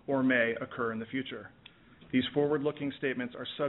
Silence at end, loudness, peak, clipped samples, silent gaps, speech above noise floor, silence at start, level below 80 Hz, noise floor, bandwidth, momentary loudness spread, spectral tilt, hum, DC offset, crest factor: 0 s; -32 LUFS; -14 dBFS; under 0.1%; none; 25 dB; 0.1 s; -68 dBFS; -56 dBFS; 4.1 kHz; 11 LU; -4 dB/octave; none; under 0.1%; 18 dB